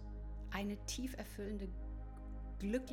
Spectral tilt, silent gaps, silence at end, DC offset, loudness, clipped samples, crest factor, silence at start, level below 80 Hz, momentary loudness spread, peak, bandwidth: -5 dB/octave; none; 0 s; under 0.1%; -45 LUFS; under 0.1%; 18 dB; 0 s; -48 dBFS; 9 LU; -26 dBFS; 19 kHz